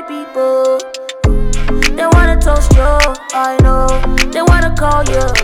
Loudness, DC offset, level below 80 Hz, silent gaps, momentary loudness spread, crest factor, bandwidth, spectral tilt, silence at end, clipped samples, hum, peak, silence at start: -13 LUFS; under 0.1%; -12 dBFS; none; 7 LU; 10 dB; 14.5 kHz; -5 dB/octave; 0 s; under 0.1%; none; 0 dBFS; 0 s